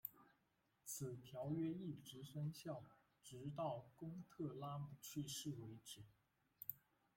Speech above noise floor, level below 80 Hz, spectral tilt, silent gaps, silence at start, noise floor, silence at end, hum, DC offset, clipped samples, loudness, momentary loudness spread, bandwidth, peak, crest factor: 34 dB; -82 dBFS; -5.5 dB/octave; none; 0.05 s; -84 dBFS; 0.4 s; none; under 0.1%; under 0.1%; -51 LUFS; 12 LU; 16.5 kHz; -28 dBFS; 24 dB